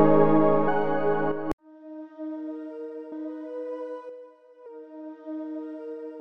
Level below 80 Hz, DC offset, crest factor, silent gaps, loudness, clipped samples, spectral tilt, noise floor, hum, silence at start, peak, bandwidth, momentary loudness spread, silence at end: -60 dBFS; under 0.1%; 20 dB; 1.53-1.58 s; -28 LUFS; under 0.1%; -9.5 dB/octave; -48 dBFS; none; 0 s; -6 dBFS; 4.7 kHz; 22 LU; 0 s